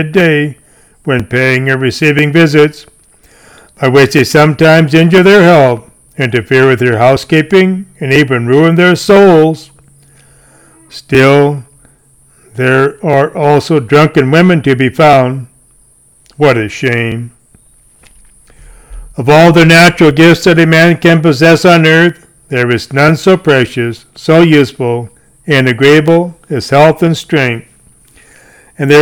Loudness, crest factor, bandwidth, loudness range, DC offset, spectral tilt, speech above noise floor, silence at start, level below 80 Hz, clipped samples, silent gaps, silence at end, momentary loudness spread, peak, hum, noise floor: -8 LUFS; 8 dB; 17.5 kHz; 6 LU; 0.2%; -6 dB/octave; 39 dB; 0 s; -42 dBFS; 2%; none; 0 s; 12 LU; 0 dBFS; none; -46 dBFS